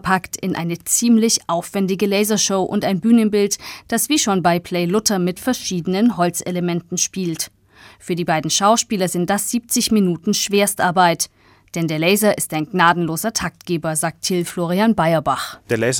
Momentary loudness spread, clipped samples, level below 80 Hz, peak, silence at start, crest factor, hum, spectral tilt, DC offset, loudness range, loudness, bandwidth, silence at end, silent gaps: 8 LU; under 0.1%; -54 dBFS; 0 dBFS; 0.05 s; 18 dB; none; -4 dB/octave; under 0.1%; 3 LU; -18 LUFS; 18 kHz; 0 s; none